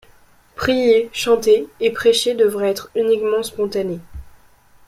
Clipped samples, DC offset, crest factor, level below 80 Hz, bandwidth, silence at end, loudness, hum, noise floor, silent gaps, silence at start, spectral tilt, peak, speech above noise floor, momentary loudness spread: under 0.1%; under 0.1%; 16 dB; -48 dBFS; 15.5 kHz; 0.6 s; -18 LUFS; none; -50 dBFS; none; 0.6 s; -3.5 dB/octave; -2 dBFS; 33 dB; 8 LU